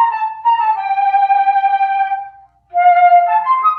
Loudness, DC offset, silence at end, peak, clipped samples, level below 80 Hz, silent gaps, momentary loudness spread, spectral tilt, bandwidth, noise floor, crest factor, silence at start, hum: -13 LUFS; under 0.1%; 0 s; -2 dBFS; under 0.1%; -66 dBFS; none; 8 LU; -3 dB/octave; 4.7 kHz; -39 dBFS; 12 dB; 0 s; none